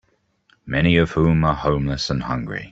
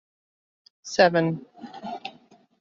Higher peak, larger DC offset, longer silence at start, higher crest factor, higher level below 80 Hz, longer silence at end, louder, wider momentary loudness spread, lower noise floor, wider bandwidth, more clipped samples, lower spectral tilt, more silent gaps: about the same, -4 dBFS vs -4 dBFS; neither; second, 0.65 s vs 0.85 s; second, 18 dB vs 24 dB; first, -36 dBFS vs -70 dBFS; second, 0 s vs 0.5 s; first, -20 LUFS vs -23 LUFS; second, 9 LU vs 22 LU; first, -63 dBFS vs -56 dBFS; about the same, 7.8 kHz vs 7.6 kHz; neither; first, -6.5 dB/octave vs -4 dB/octave; neither